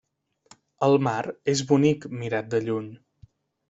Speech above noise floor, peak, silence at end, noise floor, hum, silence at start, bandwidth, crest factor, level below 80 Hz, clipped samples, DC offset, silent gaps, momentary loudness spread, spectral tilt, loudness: 35 dB; -6 dBFS; 0.75 s; -58 dBFS; none; 0.8 s; 8 kHz; 20 dB; -64 dBFS; under 0.1%; under 0.1%; none; 9 LU; -6 dB/octave; -24 LUFS